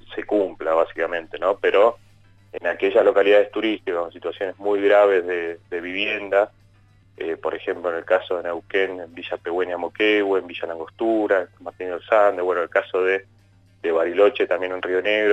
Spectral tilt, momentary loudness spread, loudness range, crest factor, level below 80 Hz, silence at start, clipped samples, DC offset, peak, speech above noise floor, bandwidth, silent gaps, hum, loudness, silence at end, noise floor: -5.5 dB/octave; 13 LU; 5 LU; 16 dB; -62 dBFS; 0.05 s; under 0.1%; under 0.1%; -6 dBFS; 33 dB; 8 kHz; none; none; -21 LUFS; 0 s; -54 dBFS